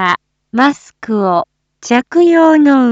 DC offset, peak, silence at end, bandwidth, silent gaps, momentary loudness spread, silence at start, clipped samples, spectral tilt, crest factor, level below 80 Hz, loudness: under 0.1%; 0 dBFS; 0 s; 7.8 kHz; none; 16 LU; 0 s; under 0.1%; -5.5 dB/octave; 12 dB; -60 dBFS; -12 LUFS